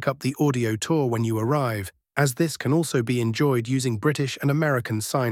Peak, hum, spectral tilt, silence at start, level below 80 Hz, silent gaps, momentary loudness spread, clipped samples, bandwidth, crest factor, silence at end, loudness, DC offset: -6 dBFS; none; -6 dB/octave; 0 s; -60 dBFS; none; 3 LU; under 0.1%; 16.5 kHz; 18 dB; 0 s; -24 LUFS; under 0.1%